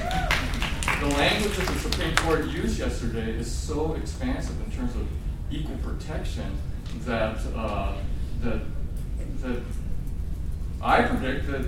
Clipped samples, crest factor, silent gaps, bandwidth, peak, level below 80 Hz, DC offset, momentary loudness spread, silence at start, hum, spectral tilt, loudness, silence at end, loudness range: under 0.1%; 24 dB; none; 16.5 kHz; -2 dBFS; -30 dBFS; under 0.1%; 12 LU; 0 s; none; -5 dB/octave; -28 LUFS; 0 s; 7 LU